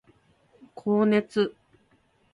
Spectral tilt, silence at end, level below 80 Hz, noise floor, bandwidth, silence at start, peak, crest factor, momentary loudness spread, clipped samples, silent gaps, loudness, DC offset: -7.5 dB/octave; 0.85 s; -70 dBFS; -65 dBFS; 11 kHz; 0.75 s; -10 dBFS; 18 dB; 8 LU; under 0.1%; none; -25 LUFS; under 0.1%